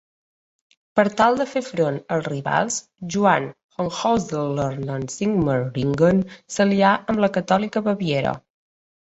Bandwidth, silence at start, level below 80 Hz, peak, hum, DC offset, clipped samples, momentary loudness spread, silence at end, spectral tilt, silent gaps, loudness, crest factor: 8.2 kHz; 0.95 s; -54 dBFS; -2 dBFS; none; under 0.1%; under 0.1%; 10 LU; 0.65 s; -5.5 dB/octave; 3.64-3.69 s; -21 LUFS; 20 dB